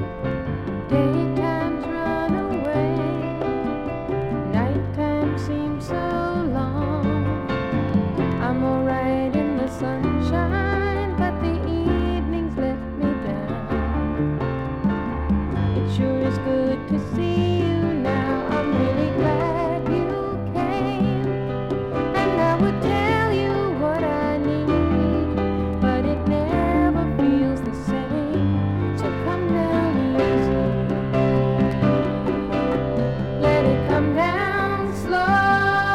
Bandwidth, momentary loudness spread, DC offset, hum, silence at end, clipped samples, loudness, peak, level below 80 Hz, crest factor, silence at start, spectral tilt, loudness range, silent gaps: 12 kHz; 6 LU; under 0.1%; none; 0 s; under 0.1%; -22 LUFS; -6 dBFS; -36 dBFS; 16 dB; 0 s; -8 dB/octave; 3 LU; none